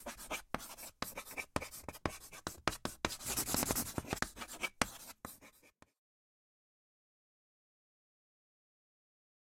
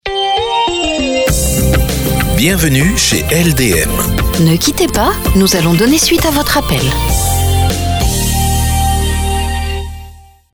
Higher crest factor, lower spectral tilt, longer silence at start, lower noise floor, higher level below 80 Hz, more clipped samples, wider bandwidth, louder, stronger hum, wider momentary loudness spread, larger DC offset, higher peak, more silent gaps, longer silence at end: first, 34 dB vs 12 dB; second, -2.5 dB/octave vs -4 dB/octave; about the same, 0 s vs 0.05 s; first, -67 dBFS vs -36 dBFS; second, -60 dBFS vs -20 dBFS; neither; second, 16.5 kHz vs over 20 kHz; second, -40 LUFS vs -12 LUFS; neither; first, 14 LU vs 5 LU; neither; second, -10 dBFS vs 0 dBFS; neither; first, 3.8 s vs 0.35 s